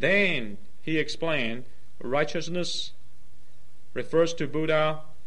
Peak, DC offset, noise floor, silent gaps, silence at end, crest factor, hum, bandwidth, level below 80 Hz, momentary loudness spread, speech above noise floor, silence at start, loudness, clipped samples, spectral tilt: -10 dBFS; 4%; -60 dBFS; none; 0.25 s; 18 dB; none; 11.5 kHz; -60 dBFS; 14 LU; 33 dB; 0 s; -27 LUFS; under 0.1%; -4.5 dB/octave